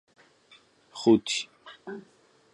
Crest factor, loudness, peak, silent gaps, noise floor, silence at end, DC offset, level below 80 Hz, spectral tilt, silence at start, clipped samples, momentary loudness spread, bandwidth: 22 dB; -25 LUFS; -8 dBFS; none; -62 dBFS; 0.55 s; under 0.1%; -70 dBFS; -4 dB/octave; 0.95 s; under 0.1%; 22 LU; 11 kHz